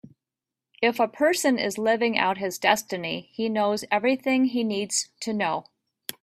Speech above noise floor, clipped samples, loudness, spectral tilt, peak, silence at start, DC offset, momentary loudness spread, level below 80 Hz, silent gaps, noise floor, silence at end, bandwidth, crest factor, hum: 64 dB; under 0.1%; -24 LUFS; -3 dB/octave; -4 dBFS; 0.05 s; under 0.1%; 8 LU; -70 dBFS; none; -89 dBFS; 0.6 s; 15.5 kHz; 22 dB; none